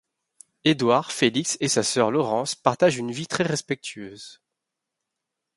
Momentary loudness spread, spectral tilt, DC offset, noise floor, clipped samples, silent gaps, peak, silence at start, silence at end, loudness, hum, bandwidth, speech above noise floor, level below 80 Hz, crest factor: 15 LU; -4 dB/octave; under 0.1%; -84 dBFS; under 0.1%; none; -2 dBFS; 0.65 s; 1.25 s; -23 LUFS; none; 11.5 kHz; 61 dB; -66 dBFS; 24 dB